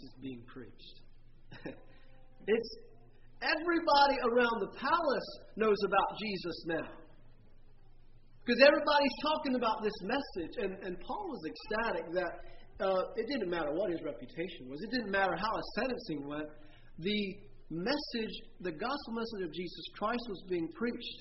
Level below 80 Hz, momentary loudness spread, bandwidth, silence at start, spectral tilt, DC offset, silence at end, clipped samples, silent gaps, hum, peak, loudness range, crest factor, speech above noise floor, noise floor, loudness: -56 dBFS; 16 LU; 5.8 kHz; 0 s; -2.5 dB/octave; under 0.1%; 0 s; under 0.1%; none; none; -10 dBFS; 7 LU; 24 dB; 20 dB; -54 dBFS; -34 LUFS